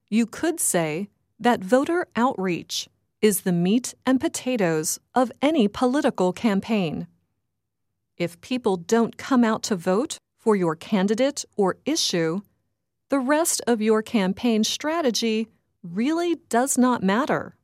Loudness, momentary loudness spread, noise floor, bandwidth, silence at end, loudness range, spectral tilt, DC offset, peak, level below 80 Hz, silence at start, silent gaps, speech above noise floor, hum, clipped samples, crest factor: -23 LUFS; 7 LU; -81 dBFS; 16 kHz; 0.15 s; 2 LU; -4.5 dB/octave; under 0.1%; -6 dBFS; -64 dBFS; 0.1 s; none; 58 dB; none; under 0.1%; 18 dB